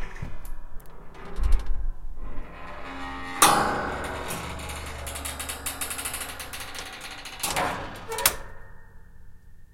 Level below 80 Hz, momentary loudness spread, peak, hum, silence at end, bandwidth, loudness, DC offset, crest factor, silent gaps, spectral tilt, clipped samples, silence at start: -34 dBFS; 20 LU; 0 dBFS; none; 0.1 s; 17 kHz; -28 LUFS; under 0.1%; 28 dB; none; -2 dB/octave; under 0.1%; 0 s